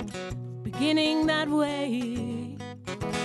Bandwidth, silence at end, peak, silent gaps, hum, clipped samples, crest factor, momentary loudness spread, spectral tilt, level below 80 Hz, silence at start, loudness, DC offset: 12 kHz; 0 s; -14 dBFS; none; none; under 0.1%; 14 dB; 13 LU; -5 dB/octave; -52 dBFS; 0 s; -28 LUFS; under 0.1%